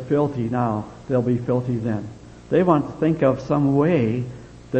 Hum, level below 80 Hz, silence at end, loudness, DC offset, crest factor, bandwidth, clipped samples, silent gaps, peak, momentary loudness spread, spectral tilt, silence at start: none; -50 dBFS; 0 s; -21 LUFS; under 0.1%; 18 dB; 8.6 kHz; under 0.1%; none; -4 dBFS; 11 LU; -9 dB/octave; 0 s